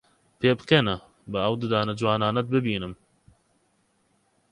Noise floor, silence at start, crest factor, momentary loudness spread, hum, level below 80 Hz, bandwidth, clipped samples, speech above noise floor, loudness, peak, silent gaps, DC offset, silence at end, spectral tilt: -68 dBFS; 0.4 s; 22 dB; 11 LU; none; -56 dBFS; 11 kHz; under 0.1%; 44 dB; -25 LUFS; -4 dBFS; none; under 0.1%; 1.55 s; -7 dB/octave